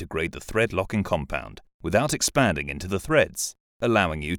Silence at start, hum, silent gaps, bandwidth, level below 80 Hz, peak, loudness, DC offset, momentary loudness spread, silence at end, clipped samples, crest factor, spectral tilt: 0 s; none; 1.74-1.79 s, 3.60-3.80 s; over 20 kHz; -42 dBFS; -6 dBFS; -25 LUFS; under 0.1%; 10 LU; 0 s; under 0.1%; 20 dB; -4 dB/octave